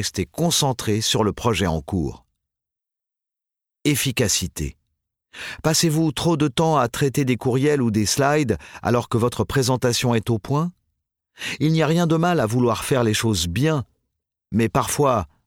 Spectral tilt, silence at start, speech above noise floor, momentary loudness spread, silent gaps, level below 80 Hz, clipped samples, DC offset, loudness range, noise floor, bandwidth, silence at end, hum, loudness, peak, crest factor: -4.5 dB/octave; 0 s; 67 dB; 8 LU; none; -44 dBFS; under 0.1%; under 0.1%; 5 LU; -87 dBFS; 18 kHz; 0.2 s; none; -21 LUFS; -6 dBFS; 16 dB